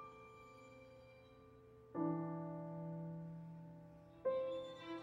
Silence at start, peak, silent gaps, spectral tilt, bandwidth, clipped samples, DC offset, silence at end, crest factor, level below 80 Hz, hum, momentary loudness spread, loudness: 0 s; -30 dBFS; none; -8.5 dB/octave; 7.4 kHz; under 0.1%; under 0.1%; 0 s; 18 dB; -76 dBFS; none; 21 LU; -46 LUFS